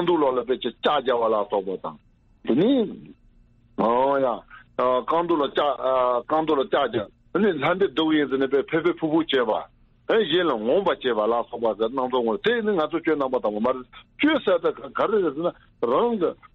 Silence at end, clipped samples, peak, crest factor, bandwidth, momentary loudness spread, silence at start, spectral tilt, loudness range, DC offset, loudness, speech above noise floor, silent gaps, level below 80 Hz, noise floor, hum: 0.2 s; under 0.1%; -10 dBFS; 14 dB; 5.8 kHz; 8 LU; 0 s; -7.5 dB/octave; 2 LU; under 0.1%; -23 LUFS; 33 dB; none; -58 dBFS; -56 dBFS; none